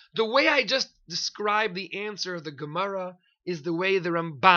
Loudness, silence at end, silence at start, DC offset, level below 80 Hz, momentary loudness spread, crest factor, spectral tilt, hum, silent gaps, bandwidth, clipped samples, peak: -26 LUFS; 0 s; 0.15 s; under 0.1%; -68 dBFS; 13 LU; 24 dB; -3.5 dB/octave; none; none; 7.2 kHz; under 0.1%; -2 dBFS